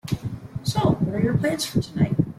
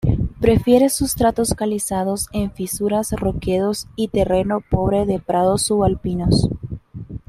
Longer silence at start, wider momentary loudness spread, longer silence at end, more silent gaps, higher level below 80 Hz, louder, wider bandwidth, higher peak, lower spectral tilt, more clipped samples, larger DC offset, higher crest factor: about the same, 0.05 s vs 0.05 s; about the same, 8 LU vs 8 LU; about the same, 0.05 s vs 0.1 s; neither; second, -46 dBFS vs -34 dBFS; second, -24 LUFS vs -19 LUFS; about the same, 15.5 kHz vs 16 kHz; second, -6 dBFS vs -2 dBFS; about the same, -6 dB/octave vs -5.5 dB/octave; neither; neither; about the same, 16 dB vs 16 dB